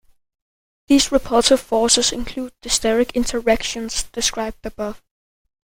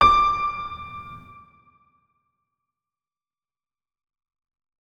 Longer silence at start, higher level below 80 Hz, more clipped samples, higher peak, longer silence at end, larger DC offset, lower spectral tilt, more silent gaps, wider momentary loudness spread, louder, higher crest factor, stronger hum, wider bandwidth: first, 0.9 s vs 0 s; first, -38 dBFS vs -46 dBFS; neither; first, 0 dBFS vs -4 dBFS; second, 0.75 s vs 3.6 s; neither; second, -2 dB/octave vs -4 dB/octave; neither; second, 13 LU vs 23 LU; first, -18 LUFS vs -22 LUFS; about the same, 20 dB vs 24 dB; neither; first, 16.5 kHz vs 9.4 kHz